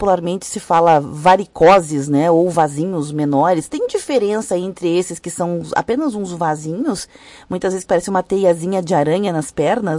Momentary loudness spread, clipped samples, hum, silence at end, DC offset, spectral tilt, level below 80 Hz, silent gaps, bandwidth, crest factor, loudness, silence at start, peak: 9 LU; under 0.1%; none; 0 s; under 0.1%; -5.5 dB/octave; -50 dBFS; none; 11.5 kHz; 14 dB; -17 LUFS; 0 s; -2 dBFS